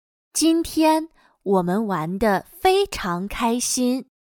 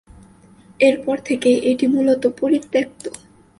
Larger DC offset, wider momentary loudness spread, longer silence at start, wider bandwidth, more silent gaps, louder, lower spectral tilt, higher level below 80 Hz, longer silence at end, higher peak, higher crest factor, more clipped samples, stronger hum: neither; about the same, 7 LU vs 9 LU; second, 0.35 s vs 0.8 s; first, 19 kHz vs 11.5 kHz; neither; second, -21 LUFS vs -18 LUFS; about the same, -4 dB/octave vs -5 dB/octave; first, -46 dBFS vs -56 dBFS; second, 0.25 s vs 0.5 s; second, -6 dBFS vs -2 dBFS; about the same, 16 dB vs 16 dB; neither; neither